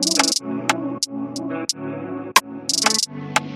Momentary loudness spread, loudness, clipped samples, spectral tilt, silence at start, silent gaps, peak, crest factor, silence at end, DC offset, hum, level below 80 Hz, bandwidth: 10 LU; -21 LUFS; under 0.1%; -1.5 dB/octave; 0 s; none; 0 dBFS; 22 dB; 0 s; under 0.1%; none; -64 dBFS; 15.5 kHz